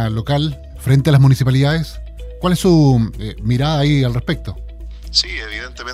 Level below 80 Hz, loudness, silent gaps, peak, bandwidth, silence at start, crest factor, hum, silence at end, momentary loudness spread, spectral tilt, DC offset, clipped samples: -32 dBFS; -16 LUFS; none; 0 dBFS; 14 kHz; 0 s; 16 dB; none; 0 s; 18 LU; -6.5 dB/octave; under 0.1%; under 0.1%